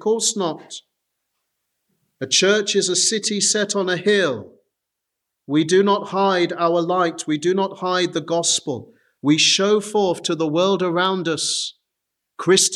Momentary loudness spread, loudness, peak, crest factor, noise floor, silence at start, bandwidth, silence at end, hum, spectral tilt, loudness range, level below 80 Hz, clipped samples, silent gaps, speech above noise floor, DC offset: 10 LU; -19 LUFS; -2 dBFS; 18 dB; -81 dBFS; 0 s; 13 kHz; 0 s; none; -3 dB/octave; 2 LU; -74 dBFS; under 0.1%; none; 62 dB; under 0.1%